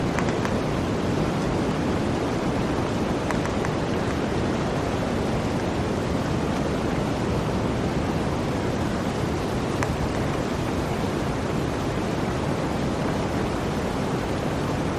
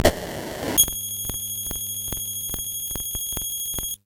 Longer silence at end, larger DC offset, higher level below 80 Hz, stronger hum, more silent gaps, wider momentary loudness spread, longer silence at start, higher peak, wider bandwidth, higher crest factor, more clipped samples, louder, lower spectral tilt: about the same, 0 s vs 0.1 s; neither; about the same, -38 dBFS vs -40 dBFS; neither; neither; second, 2 LU vs 8 LU; about the same, 0 s vs 0 s; second, -6 dBFS vs 0 dBFS; second, 14.5 kHz vs 17.5 kHz; second, 20 dB vs 26 dB; neither; about the same, -25 LUFS vs -24 LUFS; first, -6 dB/octave vs -2 dB/octave